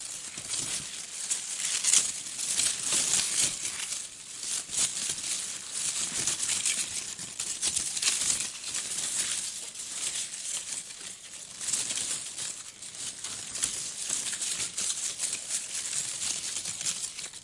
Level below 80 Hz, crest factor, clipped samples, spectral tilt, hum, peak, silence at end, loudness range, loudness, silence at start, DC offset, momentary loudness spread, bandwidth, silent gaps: -68 dBFS; 28 dB; under 0.1%; 1.5 dB/octave; none; -4 dBFS; 0 s; 6 LU; -29 LUFS; 0 s; under 0.1%; 11 LU; 11.5 kHz; none